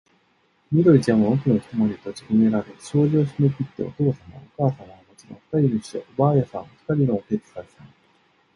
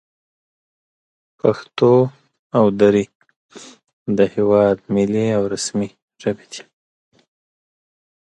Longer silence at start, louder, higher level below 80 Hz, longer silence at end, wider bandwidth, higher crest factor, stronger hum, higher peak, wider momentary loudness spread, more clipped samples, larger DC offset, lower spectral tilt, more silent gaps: second, 0.7 s vs 1.45 s; second, -22 LUFS vs -18 LUFS; about the same, -56 dBFS vs -56 dBFS; second, 0.7 s vs 1.75 s; about the same, 11 kHz vs 11.5 kHz; about the same, 18 dB vs 18 dB; neither; about the same, -4 dBFS vs -2 dBFS; about the same, 15 LU vs 15 LU; neither; neither; first, -9 dB/octave vs -6 dB/octave; second, none vs 2.39-2.50 s, 3.15-3.20 s, 3.36-3.49 s, 3.93-4.06 s, 6.02-6.08 s